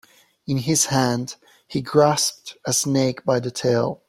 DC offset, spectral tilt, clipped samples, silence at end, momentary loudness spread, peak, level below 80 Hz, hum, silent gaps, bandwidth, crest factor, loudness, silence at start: under 0.1%; -4 dB/octave; under 0.1%; 0.15 s; 12 LU; -2 dBFS; -58 dBFS; none; none; 16 kHz; 20 dB; -21 LUFS; 0.5 s